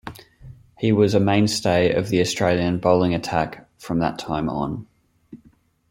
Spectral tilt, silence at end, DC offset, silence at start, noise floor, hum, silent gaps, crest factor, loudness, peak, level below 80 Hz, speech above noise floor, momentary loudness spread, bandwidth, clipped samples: -5.5 dB/octave; 0.55 s; under 0.1%; 0.05 s; -57 dBFS; none; none; 20 dB; -21 LUFS; -2 dBFS; -50 dBFS; 37 dB; 11 LU; 16.5 kHz; under 0.1%